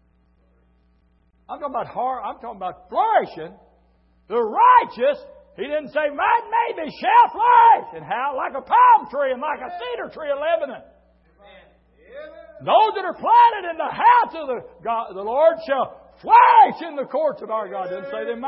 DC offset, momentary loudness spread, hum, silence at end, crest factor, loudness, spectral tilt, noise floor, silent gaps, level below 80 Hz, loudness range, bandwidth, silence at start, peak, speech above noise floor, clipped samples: under 0.1%; 18 LU; none; 0 s; 18 dB; -19 LUFS; -8.5 dB/octave; -60 dBFS; none; -62 dBFS; 9 LU; 5.8 kHz; 1.5 s; -2 dBFS; 41 dB; under 0.1%